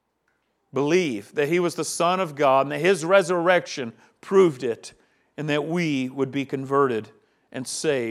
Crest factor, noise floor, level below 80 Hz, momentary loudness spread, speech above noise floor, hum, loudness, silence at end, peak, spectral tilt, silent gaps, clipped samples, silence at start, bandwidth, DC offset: 20 dB; -72 dBFS; -76 dBFS; 13 LU; 49 dB; none; -23 LUFS; 0 s; -4 dBFS; -5 dB/octave; none; under 0.1%; 0.75 s; 14 kHz; under 0.1%